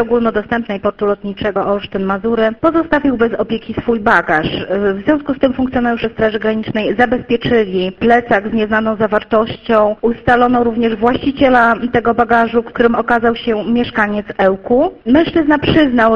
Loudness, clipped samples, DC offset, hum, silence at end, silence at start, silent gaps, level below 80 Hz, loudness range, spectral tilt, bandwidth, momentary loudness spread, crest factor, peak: -14 LUFS; under 0.1%; under 0.1%; none; 0 s; 0 s; none; -38 dBFS; 3 LU; -7.5 dB/octave; 6.6 kHz; 6 LU; 14 dB; 0 dBFS